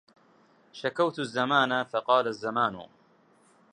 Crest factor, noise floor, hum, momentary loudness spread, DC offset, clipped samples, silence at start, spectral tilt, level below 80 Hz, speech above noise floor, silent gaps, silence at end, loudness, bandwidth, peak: 20 dB; -62 dBFS; none; 10 LU; under 0.1%; under 0.1%; 0.75 s; -5 dB/octave; -74 dBFS; 35 dB; none; 0.85 s; -27 LUFS; 10 kHz; -8 dBFS